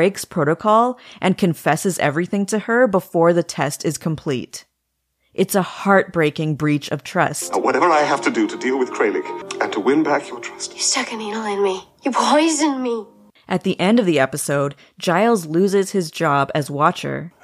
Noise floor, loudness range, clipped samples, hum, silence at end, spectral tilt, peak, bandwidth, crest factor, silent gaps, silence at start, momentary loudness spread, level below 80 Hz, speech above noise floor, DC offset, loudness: -73 dBFS; 2 LU; under 0.1%; none; 0.15 s; -4.5 dB/octave; -2 dBFS; 15.5 kHz; 18 dB; none; 0 s; 10 LU; -62 dBFS; 54 dB; under 0.1%; -19 LUFS